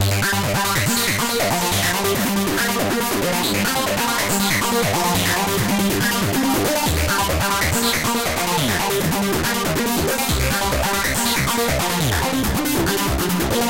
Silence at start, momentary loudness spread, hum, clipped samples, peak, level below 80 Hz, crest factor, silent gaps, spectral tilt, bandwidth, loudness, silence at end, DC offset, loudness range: 0 s; 2 LU; none; under 0.1%; -8 dBFS; -34 dBFS; 12 dB; none; -3.5 dB/octave; 17 kHz; -19 LUFS; 0 s; under 0.1%; 1 LU